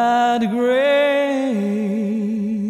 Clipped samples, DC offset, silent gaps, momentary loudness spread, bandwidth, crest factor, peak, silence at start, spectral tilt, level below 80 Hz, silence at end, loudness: under 0.1%; under 0.1%; none; 6 LU; 13.5 kHz; 10 dB; -8 dBFS; 0 s; -6 dB/octave; -64 dBFS; 0 s; -18 LUFS